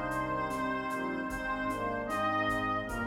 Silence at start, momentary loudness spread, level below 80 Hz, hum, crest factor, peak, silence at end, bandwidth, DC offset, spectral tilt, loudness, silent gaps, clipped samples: 0 s; 4 LU; -50 dBFS; none; 14 dB; -20 dBFS; 0 s; 17 kHz; under 0.1%; -5.5 dB/octave; -33 LUFS; none; under 0.1%